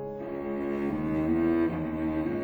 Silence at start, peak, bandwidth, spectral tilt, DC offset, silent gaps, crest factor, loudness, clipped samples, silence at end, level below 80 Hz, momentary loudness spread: 0 s; -16 dBFS; 4.7 kHz; -9.5 dB/octave; under 0.1%; none; 12 dB; -29 LUFS; under 0.1%; 0 s; -50 dBFS; 8 LU